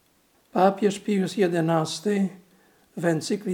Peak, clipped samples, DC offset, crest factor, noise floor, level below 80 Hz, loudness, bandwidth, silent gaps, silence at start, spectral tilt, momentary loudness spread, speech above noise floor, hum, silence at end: -6 dBFS; under 0.1%; under 0.1%; 20 dB; -63 dBFS; -76 dBFS; -24 LUFS; 17 kHz; none; 0.55 s; -6 dB/octave; 8 LU; 40 dB; none; 0 s